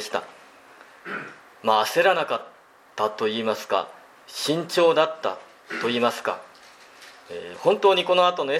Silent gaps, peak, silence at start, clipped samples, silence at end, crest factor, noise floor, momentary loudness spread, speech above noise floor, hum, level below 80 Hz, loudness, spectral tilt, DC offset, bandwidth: none; -4 dBFS; 0 s; under 0.1%; 0 s; 20 dB; -49 dBFS; 19 LU; 26 dB; none; -78 dBFS; -23 LUFS; -3.5 dB/octave; under 0.1%; 16 kHz